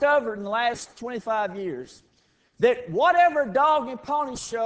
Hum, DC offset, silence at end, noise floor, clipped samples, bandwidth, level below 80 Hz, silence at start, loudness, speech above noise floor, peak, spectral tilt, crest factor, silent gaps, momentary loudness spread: none; under 0.1%; 0 s; -65 dBFS; under 0.1%; 8 kHz; -60 dBFS; 0 s; -24 LUFS; 41 dB; -8 dBFS; -4 dB/octave; 16 dB; none; 14 LU